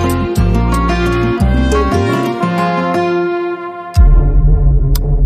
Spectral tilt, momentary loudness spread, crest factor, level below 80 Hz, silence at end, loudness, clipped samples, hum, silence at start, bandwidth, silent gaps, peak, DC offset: -7 dB/octave; 4 LU; 12 dB; -14 dBFS; 0 s; -14 LUFS; under 0.1%; none; 0 s; 15 kHz; none; 0 dBFS; under 0.1%